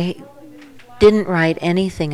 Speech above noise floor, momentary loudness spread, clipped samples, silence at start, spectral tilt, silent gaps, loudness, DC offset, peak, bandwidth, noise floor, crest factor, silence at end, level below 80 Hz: 25 dB; 11 LU; under 0.1%; 0 s; -7 dB/octave; none; -16 LUFS; under 0.1%; 0 dBFS; 12 kHz; -41 dBFS; 16 dB; 0 s; -42 dBFS